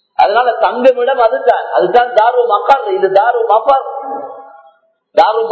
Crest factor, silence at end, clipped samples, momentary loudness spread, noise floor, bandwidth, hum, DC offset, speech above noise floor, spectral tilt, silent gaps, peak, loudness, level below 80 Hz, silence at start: 12 dB; 0 s; 0.6%; 8 LU; -49 dBFS; 8 kHz; none; under 0.1%; 38 dB; -5 dB/octave; none; 0 dBFS; -11 LUFS; -56 dBFS; 0.2 s